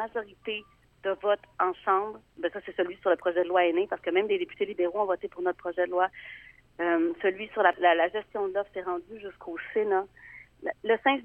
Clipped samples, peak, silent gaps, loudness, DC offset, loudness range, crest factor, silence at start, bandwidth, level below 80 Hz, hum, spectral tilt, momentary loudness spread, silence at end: under 0.1%; -8 dBFS; none; -29 LUFS; under 0.1%; 2 LU; 22 dB; 0 s; 3.8 kHz; -66 dBFS; none; -6.5 dB/octave; 13 LU; 0 s